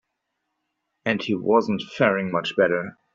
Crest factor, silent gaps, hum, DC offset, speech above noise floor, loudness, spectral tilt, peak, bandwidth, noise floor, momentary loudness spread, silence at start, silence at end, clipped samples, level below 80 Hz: 20 dB; none; none; under 0.1%; 56 dB; -23 LUFS; -6.5 dB/octave; -4 dBFS; 7.6 kHz; -78 dBFS; 7 LU; 1.05 s; 0.2 s; under 0.1%; -66 dBFS